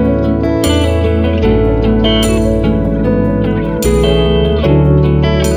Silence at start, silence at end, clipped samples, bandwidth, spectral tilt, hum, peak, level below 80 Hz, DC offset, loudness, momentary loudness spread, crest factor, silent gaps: 0 s; 0 s; under 0.1%; 16 kHz; -6.5 dB/octave; none; 0 dBFS; -18 dBFS; under 0.1%; -12 LUFS; 3 LU; 10 dB; none